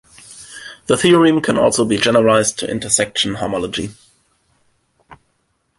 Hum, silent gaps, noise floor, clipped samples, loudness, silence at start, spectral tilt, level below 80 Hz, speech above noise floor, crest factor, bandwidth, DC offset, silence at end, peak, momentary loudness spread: none; none; -66 dBFS; under 0.1%; -15 LUFS; 0.3 s; -3.5 dB/octave; -50 dBFS; 51 dB; 18 dB; 11.5 kHz; under 0.1%; 0.65 s; 0 dBFS; 20 LU